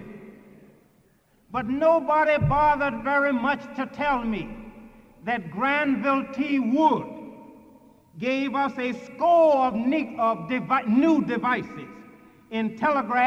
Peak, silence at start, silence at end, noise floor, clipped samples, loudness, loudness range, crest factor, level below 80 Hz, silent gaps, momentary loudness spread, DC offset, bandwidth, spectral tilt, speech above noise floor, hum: -8 dBFS; 0 s; 0 s; -61 dBFS; under 0.1%; -24 LUFS; 4 LU; 16 dB; -50 dBFS; none; 13 LU; under 0.1%; 8 kHz; -7.5 dB/octave; 38 dB; none